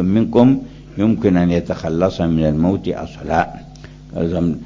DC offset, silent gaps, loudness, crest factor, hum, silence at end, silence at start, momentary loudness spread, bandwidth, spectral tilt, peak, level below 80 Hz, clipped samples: under 0.1%; none; -17 LUFS; 16 dB; none; 0 s; 0 s; 12 LU; 7.4 kHz; -8.5 dB/octave; 0 dBFS; -36 dBFS; under 0.1%